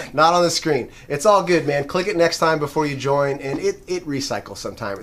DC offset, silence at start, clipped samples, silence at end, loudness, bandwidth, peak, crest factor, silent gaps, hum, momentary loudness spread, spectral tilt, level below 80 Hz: under 0.1%; 0 s; under 0.1%; 0 s; -20 LUFS; 15.5 kHz; -2 dBFS; 18 dB; none; none; 12 LU; -4.5 dB/octave; -48 dBFS